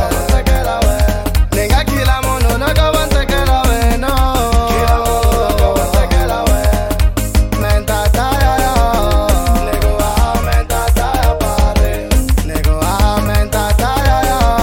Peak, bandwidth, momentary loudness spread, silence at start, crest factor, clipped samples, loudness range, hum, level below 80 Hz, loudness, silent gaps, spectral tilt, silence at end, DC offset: 0 dBFS; 17 kHz; 2 LU; 0 s; 12 dB; under 0.1%; 1 LU; none; -14 dBFS; -14 LUFS; none; -5 dB/octave; 0 s; under 0.1%